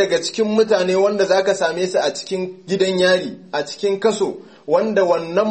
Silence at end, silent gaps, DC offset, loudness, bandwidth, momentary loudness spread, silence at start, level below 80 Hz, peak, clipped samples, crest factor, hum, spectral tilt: 0 s; none; 0.1%; -18 LUFS; 8.8 kHz; 9 LU; 0 s; -66 dBFS; -4 dBFS; under 0.1%; 14 dB; none; -4 dB/octave